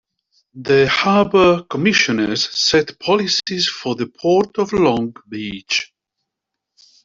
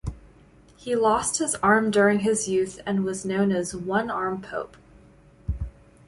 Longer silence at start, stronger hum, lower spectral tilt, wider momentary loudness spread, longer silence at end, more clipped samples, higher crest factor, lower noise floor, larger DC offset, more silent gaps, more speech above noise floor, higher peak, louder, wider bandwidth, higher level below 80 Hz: first, 0.55 s vs 0.05 s; neither; about the same, -4 dB/octave vs -4.5 dB/octave; second, 12 LU vs 15 LU; first, 1.2 s vs 0.35 s; neither; about the same, 16 dB vs 18 dB; first, -81 dBFS vs -53 dBFS; neither; neither; first, 64 dB vs 30 dB; first, -2 dBFS vs -8 dBFS; first, -16 LUFS vs -24 LUFS; second, 7.8 kHz vs 11.5 kHz; second, -52 dBFS vs -42 dBFS